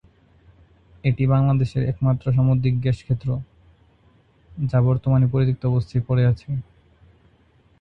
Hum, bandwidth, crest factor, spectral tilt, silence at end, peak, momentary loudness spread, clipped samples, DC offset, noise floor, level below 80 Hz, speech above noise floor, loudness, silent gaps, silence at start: none; 5.6 kHz; 16 dB; -10 dB/octave; 1.2 s; -6 dBFS; 9 LU; under 0.1%; under 0.1%; -57 dBFS; -44 dBFS; 38 dB; -21 LUFS; none; 1.05 s